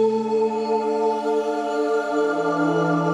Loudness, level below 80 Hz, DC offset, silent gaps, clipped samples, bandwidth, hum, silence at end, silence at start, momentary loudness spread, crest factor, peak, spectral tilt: -22 LUFS; -70 dBFS; under 0.1%; none; under 0.1%; 10.5 kHz; none; 0 s; 0 s; 2 LU; 12 dB; -8 dBFS; -6.5 dB/octave